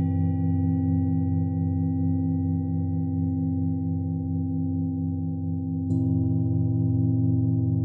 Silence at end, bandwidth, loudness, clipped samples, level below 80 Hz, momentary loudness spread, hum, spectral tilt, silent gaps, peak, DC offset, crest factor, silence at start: 0 s; 2 kHz; -26 LUFS; under 0.1%; -64 dBFS; 5 LU; none; -14 dB/octave; none; -14 dBFS; under 0.1%; 12 dB; 0 s